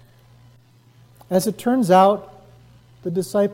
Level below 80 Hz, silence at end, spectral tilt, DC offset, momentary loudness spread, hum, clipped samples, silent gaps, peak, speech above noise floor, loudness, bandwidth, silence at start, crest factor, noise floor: -60 dBFS; 0 s; -6 dB/octave; under 0.1%; 13 LU; none; under 0.1%; none; -2 dBFS; 35 dB; -19 LUFS; 16.5 kHz; 1.3 s; 18 dB; -52 dBFS